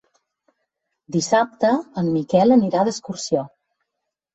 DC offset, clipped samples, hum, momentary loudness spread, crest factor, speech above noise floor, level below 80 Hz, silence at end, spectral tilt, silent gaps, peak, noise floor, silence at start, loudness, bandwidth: under 0.1%; under 0.1%; none; 10 LU; 18 dB; 62 dB; -62 dBFS; 0.85 s; -5.5 dB/octave; none; -4 dBFS; -81 dBFS; 1.1 s; -20 LUFS; 8.2 kHz